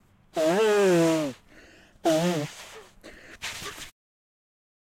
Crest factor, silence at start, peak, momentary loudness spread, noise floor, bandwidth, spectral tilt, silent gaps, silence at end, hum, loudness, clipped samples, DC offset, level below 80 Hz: 16 dB; 0.35 s; -12 dBFS; 23 LU; -53 dBFS; 16.5 kHz; -5 dB/octave; none; 1.1 s; none; -25 LUFS; under 0.1%; under 0.1%; -62 dBFS